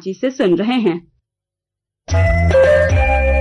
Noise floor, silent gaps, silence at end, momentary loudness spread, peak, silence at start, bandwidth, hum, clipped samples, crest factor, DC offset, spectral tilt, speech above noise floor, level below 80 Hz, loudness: -84 dBFS; none; 0 s; 9 LU; -6 dBFS; 0.05 s; 10.5 kHz; none; under 0.1%; 10 dB; under 0.1%; -7 dB/octave; 70 dB; -24 dBFS; -15 LUFS